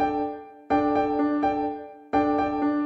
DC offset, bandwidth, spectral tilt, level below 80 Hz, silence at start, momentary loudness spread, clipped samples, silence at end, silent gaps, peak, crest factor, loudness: under 0.1%; 6 kHz; -7.5 dB/octave; -52 dBFS; 0 s; 9 LU; under 0.1%; 0 s; none; -10 dBFS; 16 dB; -25 LUFS